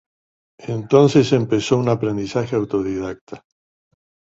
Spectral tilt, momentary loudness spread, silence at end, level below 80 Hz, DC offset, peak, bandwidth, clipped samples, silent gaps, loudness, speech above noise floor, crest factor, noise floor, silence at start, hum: -6.5 dB/octave; 17 LU; 0.95 s; -52 dBFS; under 0.1%; -2 dBFS; 8 kHz; under 0.1%; 3.21-3.27 s; -18 LUFS; over 72 dB; 18 dB; under -90 dBFS; 0.6 s; none